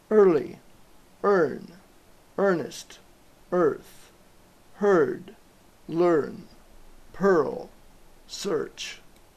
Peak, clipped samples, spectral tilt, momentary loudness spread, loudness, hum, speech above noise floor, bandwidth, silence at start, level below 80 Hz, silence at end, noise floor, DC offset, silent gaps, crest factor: -8 dBFS; under 0.1%; -6 dB/octave; 18 LU; -25 LUFS; none; 31 dB; 14 kHz; 0.1 s; -56 dBFS; 0.4 s; -55 dBFS; under 0.1%; none; 18 dB